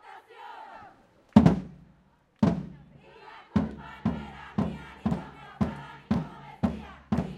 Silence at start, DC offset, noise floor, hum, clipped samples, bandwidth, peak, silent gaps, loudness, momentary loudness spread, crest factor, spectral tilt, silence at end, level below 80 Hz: 0.05 s; under 0.1%; -63 dBFS; none; under 0.1%; 9 kHz; -2 dBFS; none; -29 LUFS; 23 LU; 28 dB; -8.5 dB/octave; 0 s; -48 dBFS